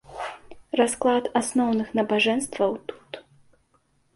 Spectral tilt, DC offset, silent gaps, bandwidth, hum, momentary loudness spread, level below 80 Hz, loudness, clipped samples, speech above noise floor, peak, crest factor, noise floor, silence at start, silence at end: -3.5 dB/octave; under 0.1%; none; 11.5 kHz; none; 16 LU; -62 dBFS; -24 LUFS; under 0.1%; 43 dB; -8 dBFS; 18 dB; -66 dBFS; 0.1 s; 0.95 s